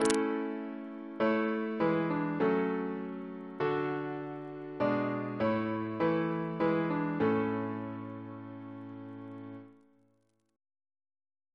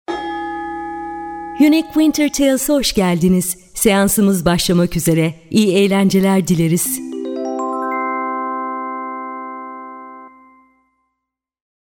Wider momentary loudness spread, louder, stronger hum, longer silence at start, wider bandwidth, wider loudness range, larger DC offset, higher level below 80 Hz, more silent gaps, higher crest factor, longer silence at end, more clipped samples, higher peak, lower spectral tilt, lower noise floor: about the same, 15 LU vs 14 LU; second, -33 LUFS vs -16 LUFS; neither; about the same, 0 s vs 0.1 s; second, 11 kHz vs 18 kHz; about the same, 13 LU vs 11 LU; neither; second, -72 dBFS vs -42 dBFS; neither; first, 26 dB vs 16 dB; first, 1.8 s vs 1.55 s; neither; second, -8 dBFS vs -2 dBFS; first, -6.5 dB/octave vs -5 dB/octave; second, -74 dBFS vs -79 dBFS